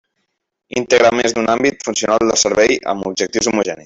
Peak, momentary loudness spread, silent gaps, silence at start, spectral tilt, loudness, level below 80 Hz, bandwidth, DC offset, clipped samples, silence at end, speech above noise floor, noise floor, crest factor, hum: 0 dBFS; 7 LU; none; 0.75 s; -2.5 dB/octave; -15 LUFS; -50 dBFS; 8.4 kHz; under 0.1%; under 0.1%; 0.05 s; 56 dB; -71 dBFS; 16 dB; none